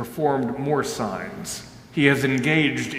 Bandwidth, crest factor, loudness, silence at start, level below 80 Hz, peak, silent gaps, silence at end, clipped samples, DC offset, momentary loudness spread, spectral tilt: 16 kHz; 22 dB; -23 LUFS; 0 s; -56 dBFS; -2 dBFS; none; 0 s; under 0.1%; under 0.1%; 13 LU; -5 dB/octave